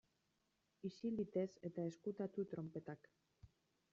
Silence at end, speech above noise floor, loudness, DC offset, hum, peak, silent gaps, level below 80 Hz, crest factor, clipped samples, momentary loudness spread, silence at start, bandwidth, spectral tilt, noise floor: 0.45 s; 39 dB; -47 LUFS; under 0.1%; none; -30 dBFS; none; -80 dBFS; 18 dB; under 0.1%; 10 LU; 0.85 s; 7.4 kHz; -8.5 dB/octave; -85 dBFS